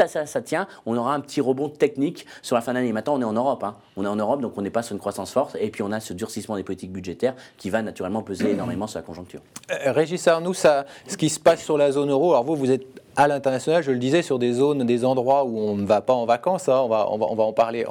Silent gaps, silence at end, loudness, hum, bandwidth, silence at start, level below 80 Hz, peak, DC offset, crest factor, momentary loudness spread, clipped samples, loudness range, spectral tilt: none; 0 s; -23 LUFS; none; 19.5 kHz; 0 s; -66 dBFS; -6 dBFS; under 0.1%; 16 dB; 10 LU; under 0.1%; 7 LU; -5.5 dB/octave